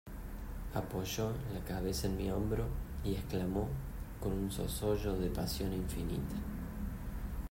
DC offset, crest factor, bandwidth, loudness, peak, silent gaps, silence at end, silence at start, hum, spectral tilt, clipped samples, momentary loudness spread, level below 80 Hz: under 0.1%; 16 dB; 16 kHz; -39 LUFS; -22 dBFS; none; 0.05 s; 0.05 s; none; -6 dB/octave; under 0.1%; 8 LU; -44 dBFS